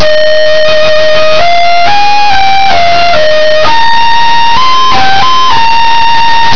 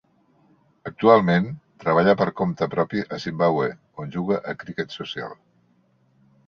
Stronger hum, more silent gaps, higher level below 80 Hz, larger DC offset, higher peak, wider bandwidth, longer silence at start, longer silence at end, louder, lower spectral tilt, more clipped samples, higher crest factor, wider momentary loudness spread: neither; neither; first, -34 dBFS vs -60 dBFS; first, 60% vs under 0.1%; about the same, 0 dBFS vs -2 dBFS; second, 5.4 kHz vs 6.8 kHz; second, 0 s vs 0.85 s; second, 0 s vs 1.15 s; first, -6 LUFS vs -22 LUFS; second, -2.5 dB/octave vs -7.5 dB/octave; first, 60% vs under 0.1%; second, 0 dB vs 22 dB; second, 0 LU vs 16 LU